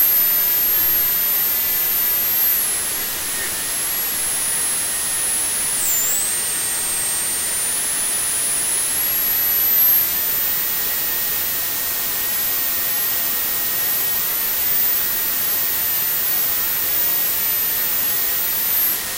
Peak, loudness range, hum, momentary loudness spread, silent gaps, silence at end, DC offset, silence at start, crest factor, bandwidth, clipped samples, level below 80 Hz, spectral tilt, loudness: -6 dBFS; 2 LU; none; 5 LU; none; 0 s; under 0.1%; 0 s; 14 dB; 16 kHz; under 0.1%; -50 dBFS; 0.5 dB/octave; -16 LUFS